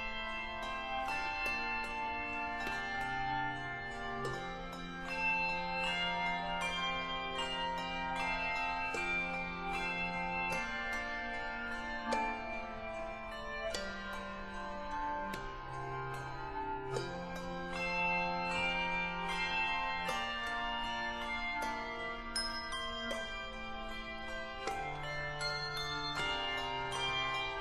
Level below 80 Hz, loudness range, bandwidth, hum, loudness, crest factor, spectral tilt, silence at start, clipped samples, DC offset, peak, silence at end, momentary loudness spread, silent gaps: -52 dBFS; 6 LU; 13.5 kHz; none; -37 LUFS; 16 dB; -3.5 dB/octave; 0 s; under 0.1%; under 0.1%; -22 dBFS; 0 s; 9 LU; none